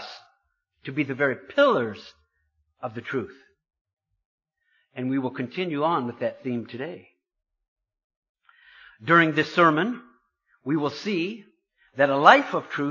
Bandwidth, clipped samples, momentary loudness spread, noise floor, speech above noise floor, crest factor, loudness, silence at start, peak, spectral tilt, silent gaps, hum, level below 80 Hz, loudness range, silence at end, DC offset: 7.4 kHz; under 0.1%; 20 LU; -73 dBFS; 49 dB; 24 dB; -23 LUFS; 0 s; -2 dBFS; -6 dB/octave; 3.81-3.85 s, 3.93-3.97 s, 4.25-4.38 s, 7.68-7.76 s, 8.04-8.10 s, 8.17-8.23 s, 8.29-8.35 s; none; -72 dBFS; 10 LU; 0 s; under 0.1%